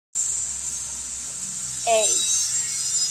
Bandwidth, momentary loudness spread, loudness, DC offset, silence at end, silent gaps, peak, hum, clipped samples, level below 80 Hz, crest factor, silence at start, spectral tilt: 16 kHz; 10 LU; -22 LUFS; under 0.1%; 0 s; none; -8 dBFS; none; under 0.1%; -56 dBFS; 18 dB; 0.15 s; 0.5 dB/octave